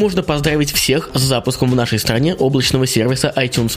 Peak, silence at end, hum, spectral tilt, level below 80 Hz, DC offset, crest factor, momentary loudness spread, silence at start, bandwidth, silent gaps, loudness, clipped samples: 0 dBFS; 0 s; none; -4.5 dB/octave; -36 dBFS; under 0.1%; 16 dB; 2 LU; 0 s; 15.5 kHz; none; -15 LUFS; under 0.1%